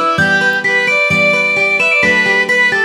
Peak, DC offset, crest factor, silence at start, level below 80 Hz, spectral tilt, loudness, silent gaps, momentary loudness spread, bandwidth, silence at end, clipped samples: 0 dBFS; under 0.1%; 12 dB; 0 s; -50 dBFS; -3.5 dB/octave; -10 LUFS; none; 2 LU; 19 kHz; 0 s; under 0.1%